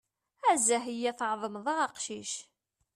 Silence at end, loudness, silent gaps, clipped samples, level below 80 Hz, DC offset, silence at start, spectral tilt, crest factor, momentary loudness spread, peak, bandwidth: 0.55 s; -31 LUFS; none; under 0.1%; -80 dBFS; under 0.1%; 0.45 s; -1.5 dB/octave; 18 dB; 12 LU; -14 dBFS; 14 kHz